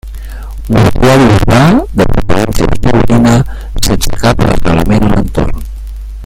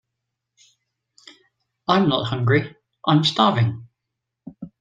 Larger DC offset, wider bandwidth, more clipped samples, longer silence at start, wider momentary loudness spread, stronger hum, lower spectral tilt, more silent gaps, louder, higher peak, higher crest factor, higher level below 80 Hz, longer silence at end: neither; first, 16.5 kHz vs 9.2 kHz; first, 0.5% vs under 0.1%; second, 0.05 s vs 1.9 s; about the same, 18 LU vs 20 LU; neither; about the same, -6 dB/octave vs -6.5 dB/octave; neither; first, -9 LUFS vs -20 LUFS; first, 0 dBFS vs -4 dBFS; second, 8 dB vs 20 dB; first, -16 dBFS vs -60 dBFS; second, 0 s vs 0.15 s